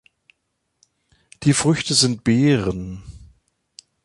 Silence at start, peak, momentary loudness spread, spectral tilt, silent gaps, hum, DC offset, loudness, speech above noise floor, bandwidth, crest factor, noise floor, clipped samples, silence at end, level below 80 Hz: 1.4 s; -2 dBFS; 15 LU; -4.5 dB/octave; none; none; under 0.1%; -18 LUFS; 55 dB; 11.5 kHz; 20 dB; -74 dBFS; under 0.1%; 0.8 s; -46 dBFS